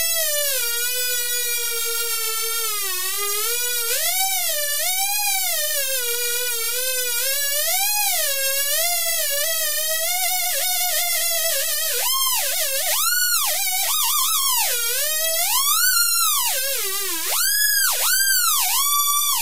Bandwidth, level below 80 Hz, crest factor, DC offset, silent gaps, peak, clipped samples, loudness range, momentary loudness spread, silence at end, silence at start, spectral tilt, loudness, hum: 16 kHz; -68 dBFS; 18 dB; 3%; none; -4 dBFS; under 0.1%; 3 LU; 5 LU; 0 s; 0 s; 3 dB/octave; -18 LUFS; none